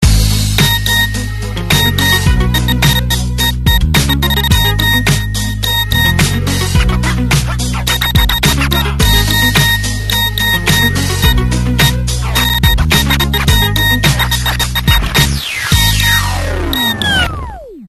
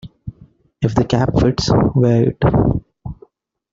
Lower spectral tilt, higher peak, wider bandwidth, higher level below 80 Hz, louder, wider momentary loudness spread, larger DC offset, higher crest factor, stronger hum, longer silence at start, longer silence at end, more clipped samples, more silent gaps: second, -3.5 dB/octave vs -7.5 dB/octave; about the same, 0 dBFS vs -2 dBFS; first, 13.5 kHz vs 7.6 kHz; first, -18 dBFS vs -34 dBFS; first, -11 LUFS vs -16 LUFS; second, 5 LU vs 20 LU; neither; about the same, 12 dB vs 14 dB; neither; about the same, 0 s vs 0.05 s; second, 0 s vs 0.6 s; neither; neither